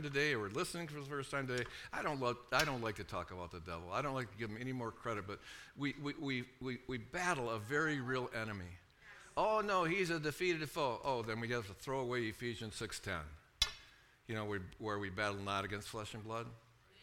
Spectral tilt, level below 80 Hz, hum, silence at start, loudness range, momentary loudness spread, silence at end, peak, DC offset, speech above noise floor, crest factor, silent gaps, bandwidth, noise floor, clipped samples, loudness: -4.5 dB/octave; -62 dBFS; none; 0 s; 5 LU; 11 LU; 0 s; -18 dBFS; under 0.1%; 23 dB; 22 dB; none; 18 kHz; -63 dBFS; under 0.1%; -40 LUFS